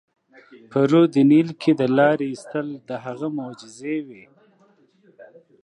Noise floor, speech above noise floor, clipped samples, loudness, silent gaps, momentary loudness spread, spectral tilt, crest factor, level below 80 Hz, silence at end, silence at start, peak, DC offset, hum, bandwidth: -58 dBFS; 38 dB; under 0.1%; -20 LUFS; none; 16 LU; -7.5 dB/octave; 18 dB; -76 dBFS; 0.4 s; 0.7 s; -4 dBFS; under 0.1%; none; 10.5 kHz